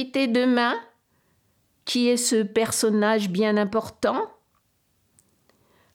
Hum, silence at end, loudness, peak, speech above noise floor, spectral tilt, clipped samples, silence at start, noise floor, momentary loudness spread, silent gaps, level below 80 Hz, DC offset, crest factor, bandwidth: none; 1.65 s; -23 LUFS; -10 dBFS; 46 dB; -3.5 dB/octave; under 0.1%; 0 s; -68 dBFS; 8 LU; none; -66 dBFS; under 0.1%; 16 dB; 17 kHz